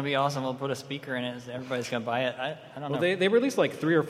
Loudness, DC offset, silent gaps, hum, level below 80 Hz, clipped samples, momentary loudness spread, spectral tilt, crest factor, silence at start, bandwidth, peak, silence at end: -29 LUFS; under 0.1%; none; none; -72 dBFS; under 0.1%; 11 LU; -5.5 dB/octave; 18 dB; 0 s; 15 kHz; -10 dBFS; 0 s